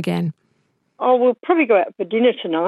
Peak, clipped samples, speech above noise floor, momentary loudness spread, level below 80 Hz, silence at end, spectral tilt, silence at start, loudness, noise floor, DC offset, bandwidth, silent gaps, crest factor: -4 dBFS; under 0.1%; 48 dB; 8 LU; -74 dBFS; 0 s; -7.5 dB/octave; 0 s; -18 LUFS; -66 dBFS; under 0.1%; 12 kHz; none; 16 dB